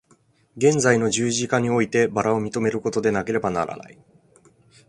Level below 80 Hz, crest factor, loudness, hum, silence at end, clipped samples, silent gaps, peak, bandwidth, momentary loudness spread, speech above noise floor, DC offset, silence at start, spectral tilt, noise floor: -56 dBFS; 20 dB; -21 LUFS; none; 1.05 s; under 0.1%; none; -2 dBFS; 11.5 kHz; 6 LU; 39 dB; under 0.1%; 0.55 s; -4.5 dB/octave; -60 dBFS